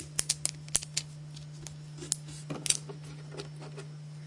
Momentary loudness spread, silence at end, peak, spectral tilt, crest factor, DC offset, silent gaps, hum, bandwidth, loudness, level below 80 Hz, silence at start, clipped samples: 15 LU; 0 s; -4 dBFS; -2 dB/octave; 34 dB; under 0.1%; none; none; 11.5 kHz; -34 LUFS; -62 dBFS; 0 s; under 0.1%